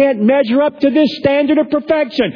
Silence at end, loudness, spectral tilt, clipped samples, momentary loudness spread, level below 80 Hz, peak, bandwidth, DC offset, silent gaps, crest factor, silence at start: 0 s; -14 LUFS; -7.5 dB/octave; under 0.1%; 3 LU; -52 dBFS; -2 dBFS; 5.4 kHz; under 0.1%; none; 12 dB; 0 s